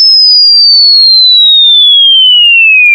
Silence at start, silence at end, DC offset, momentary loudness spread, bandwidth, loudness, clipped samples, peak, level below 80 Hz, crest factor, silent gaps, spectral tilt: 0 s; 0 s; under 0.1%; 0 LU; over 20 kHz; 0 LUFS; 6%; 0 dBFS; -78 dBFS; 4 dB; none; 6.5 dB/octave